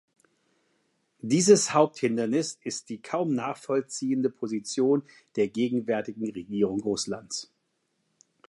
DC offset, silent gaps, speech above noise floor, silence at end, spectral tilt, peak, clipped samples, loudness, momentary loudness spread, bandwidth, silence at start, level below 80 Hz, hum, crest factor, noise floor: under 0.1%; none; 49 dB; 1.05 s; -4.5 dB/octave; -6 dBFS; under 0.1%; -27 LUFS; 14 LU; 11.5 kHz; 1.25 s; -70 dBFS; none; 22 dB; -76 dBFS